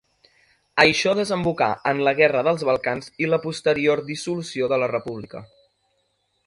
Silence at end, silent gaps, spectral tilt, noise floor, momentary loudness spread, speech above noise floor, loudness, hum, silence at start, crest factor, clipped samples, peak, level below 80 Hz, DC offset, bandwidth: 1 s; none; -4.5 dB/octave; -70 dBFS; 11 LU; 48 dB; -21 LUFS; none; 0.75 s; 22 dB; under 0.1%; 0 dBFS; -58 dBFS; under 0.1%; 11.5 kHz